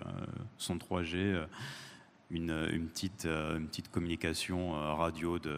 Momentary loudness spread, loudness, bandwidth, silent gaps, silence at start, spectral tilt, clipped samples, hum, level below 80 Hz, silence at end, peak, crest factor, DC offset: 9 LU; -37 LUFS; 15.5 kHz; none; 0 s; -5 dB/octave; under 0.1%; none; -54 dBFS; 0 s; -18 dBFS; 18 dB; under 0.1%